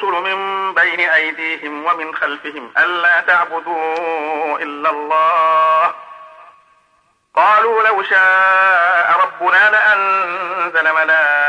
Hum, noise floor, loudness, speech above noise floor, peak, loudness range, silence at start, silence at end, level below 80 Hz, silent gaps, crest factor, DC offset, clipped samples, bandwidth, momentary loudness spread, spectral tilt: none; -59 dBFS; -14 LUFS; 44 dB; -2 dBFS; 5 LU; 0 s; 0 s; -72 dBFS; none; 12 dB; under 0.1%; under 0.1%; 10 kHz; 10 LU; -3 dB/octave